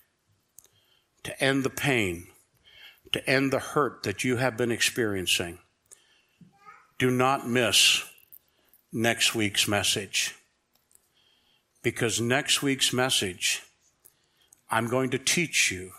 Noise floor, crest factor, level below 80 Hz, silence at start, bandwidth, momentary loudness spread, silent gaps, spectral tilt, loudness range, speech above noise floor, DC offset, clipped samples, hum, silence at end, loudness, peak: -71 dBFS; 20 dB; -64 dBFS; 1.25 s; 16 kHz; 9 LU; none; -2.5 dB/octave; 4 LU; 45 dB; under 0.1%; under 0.1%; none; 0 s; -25 LUFS; -8 dBFS